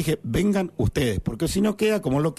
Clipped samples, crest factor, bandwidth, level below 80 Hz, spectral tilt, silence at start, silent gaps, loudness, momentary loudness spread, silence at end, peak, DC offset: under 0.1%; 10 dB; 13.5 kHz; -38 dBFS; -6 dB/octave; 0 s; none; -24 LUFS; 3 LU; 0.05 s; -12 dBFS; under 0.1%